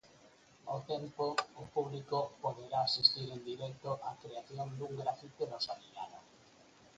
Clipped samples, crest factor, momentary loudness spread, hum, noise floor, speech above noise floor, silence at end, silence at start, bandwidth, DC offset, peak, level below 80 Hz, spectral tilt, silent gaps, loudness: under 0.1%; 28 dB; 18 LU; none; -63 dBFS; 25 dB; 0.1 s; 0.05 s; 9 kHz; under 0.1%; -12 dBFS; -74 dBFS; -4.5 dB/octave; none; -37 LUFS